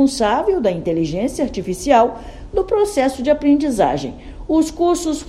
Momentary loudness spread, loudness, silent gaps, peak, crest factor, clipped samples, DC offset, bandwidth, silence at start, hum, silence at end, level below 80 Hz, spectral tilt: 9 LU; -18 LUFS; none; 0 dBFS; 16 dB; under 0.1%; under 0.1%; 13.5 kHz; 0 s; none; 0 s; -38 dBFS; -5.5 dB/octave